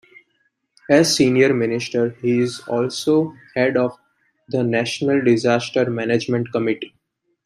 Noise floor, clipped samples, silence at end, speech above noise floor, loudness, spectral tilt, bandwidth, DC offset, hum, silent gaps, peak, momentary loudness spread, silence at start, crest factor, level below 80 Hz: -69 dBFS; under 0.1%; 0.55 s; 50 dB; -19 LUFS; -5 dB/octave; 15 kHz; under 0.1%; none; none; -2 dBFS; 8 LU; 0.9 s; 18 dB; -62 dBFS